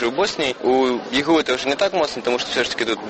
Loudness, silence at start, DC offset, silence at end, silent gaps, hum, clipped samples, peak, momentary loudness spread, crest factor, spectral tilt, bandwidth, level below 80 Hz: -20 LUFS; 0 s; under 0.1%; 0 s; none; none; under 0.1%; -4 dBFS; 3 LU; 16 dB; -3 dB/octave; 8.8 kHz; -54 dBFS